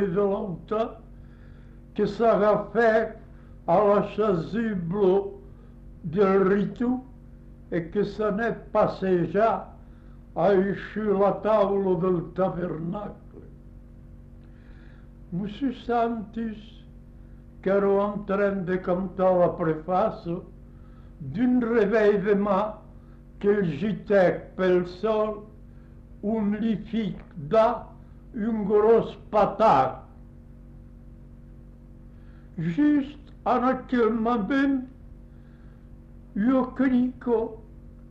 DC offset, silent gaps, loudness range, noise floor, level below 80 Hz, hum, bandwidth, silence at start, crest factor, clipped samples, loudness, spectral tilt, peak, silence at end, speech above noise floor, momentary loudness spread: under 0.1%; none; 7 LU; -47 dBFS; -48 dBFS; none; 7.4 kHz; 0 s; 16 dB; under 0.1%; -25 LUFS; -9 dB/octave; -10 dBFS; 0.05 s; 23 dB; 14 LU